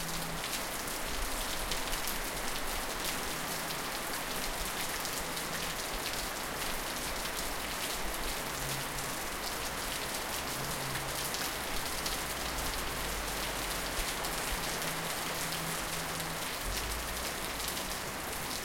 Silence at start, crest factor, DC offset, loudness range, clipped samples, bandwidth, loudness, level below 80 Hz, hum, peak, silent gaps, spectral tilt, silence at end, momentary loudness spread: 0 s; 22 dB; under 0.1%; 1 LU; under 0.1%; 17 kHz; -35 LUFS; -46 dBFS; none; -14 dBFS; none; -2 dB/octave; 0 s; 2 LU